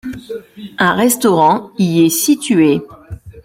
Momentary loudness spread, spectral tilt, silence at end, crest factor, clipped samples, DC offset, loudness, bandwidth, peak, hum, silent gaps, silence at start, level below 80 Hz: 20 LU; -4.5 dB/octave; 0.05 s; 14 dB; under 0.1%; under 0.1%; -13 LUFS; 16.5 kHz; -2 dBFS; none; none; 0.05 s; -48 dBFS